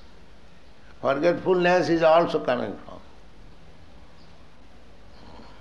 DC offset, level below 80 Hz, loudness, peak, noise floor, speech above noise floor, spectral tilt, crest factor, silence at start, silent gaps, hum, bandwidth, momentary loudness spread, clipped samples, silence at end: 0.7%; -54 dBFS; -22 LUFS; -6 dBFS; -52 dBFS; 31 dB; -6 dB/octave; 20 dB; 1 s; none; none; 9 kHz; 15 LU; under 0.1%; 0.2 s